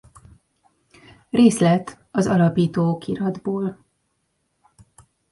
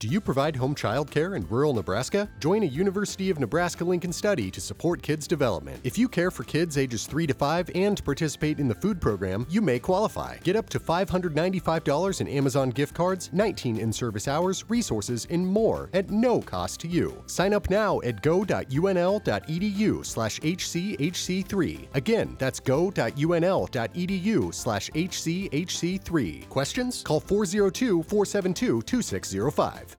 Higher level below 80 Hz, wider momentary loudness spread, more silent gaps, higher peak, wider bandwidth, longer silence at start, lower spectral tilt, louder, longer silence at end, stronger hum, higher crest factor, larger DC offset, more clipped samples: second, -56 dBFS vs -48 dBFS; first, 11 LU vs 5 LU; neither; first, -2 dBFS vs -10 dBFS; second, 11.5 kHz vs 19.5 kHz; first, 1.35 s vs 0 s; first, -7 dB/octave vs -5.5 dB/octave; first, -20 LUFS vs -26 LUFS; first, 1.6 s vs 0.05 s; neither; about the same, 20 dB vs 16 dB; neither; neither